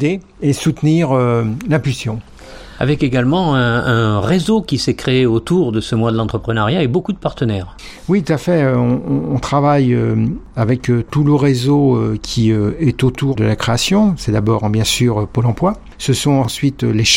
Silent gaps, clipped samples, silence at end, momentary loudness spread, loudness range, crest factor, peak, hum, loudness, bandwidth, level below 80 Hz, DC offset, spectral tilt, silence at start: none; under 0.1%; 0 s; 6 LU; 2 LU; 14 dB; 0 dBFS; none; -15 LUFS; 16.5 kHz; -36 dBFS; under 0.1%; -6 dB/octave; 0 s